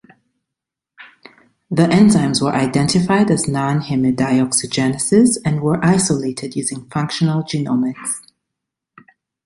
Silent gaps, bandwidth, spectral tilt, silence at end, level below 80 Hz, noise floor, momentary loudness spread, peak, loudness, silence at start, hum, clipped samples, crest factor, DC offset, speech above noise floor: none; 11.5 kHz; -5 dB/octave; 1.25 s; -50 dBFS; -83 dBFS; 10 LU; -2 dBFS; -16 LUFS; 1 s; none; under 0.1%; 16 dB; under 0.1%; 67 dB